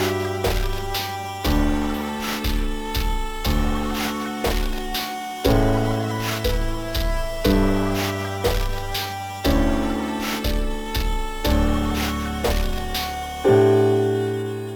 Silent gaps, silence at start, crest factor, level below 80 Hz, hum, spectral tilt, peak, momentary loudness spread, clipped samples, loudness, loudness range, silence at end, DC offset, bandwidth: none; 0 s; 18 dB; -26 dBFS; none; -5.5 dB/octave; -4 dBFS; 7 LU; under 0.1%; -23 LUFS; 4 LU; 0 s; under 0.1%; 19 kHz